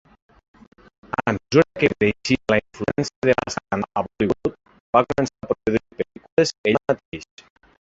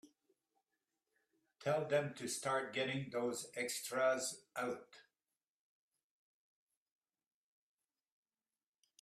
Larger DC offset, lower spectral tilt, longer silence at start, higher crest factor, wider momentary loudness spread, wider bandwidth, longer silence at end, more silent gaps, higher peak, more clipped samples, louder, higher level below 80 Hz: neither; first, -5.5 dB/octave vs -3.5 dB/octave; first, 1.2 s vs 0.05 s; about the same, 20 dB vs 20 dB; about the same, 8 LU vs 7 LU; second, 8 kHz vs 15 kHz; second, 0.6 s vs 4 s; first, 3.16-3.22 s, 4.80-4.93 s, 6.32-6.37 s, 6.58-6.64 s, 7.05-7.12 s vs none; first, -2 dBFS vs -24 dBFS; neither; first, -22 LUFS vs -40 LUFS; first, -50 dBFS vs -88 dBFS